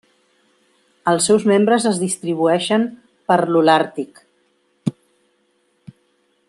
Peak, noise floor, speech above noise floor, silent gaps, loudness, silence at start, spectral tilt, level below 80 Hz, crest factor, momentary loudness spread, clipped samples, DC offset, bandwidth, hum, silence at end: -2 dBFS; -64 dBFS; 47 dB; none; -17 LUFS; 1.05 s; -4.5 dB/octave; -66 dBFS; 18 dB; 13 LU; under 0.1%; under 0.1%; 12.5 kHz; none; 1.6 s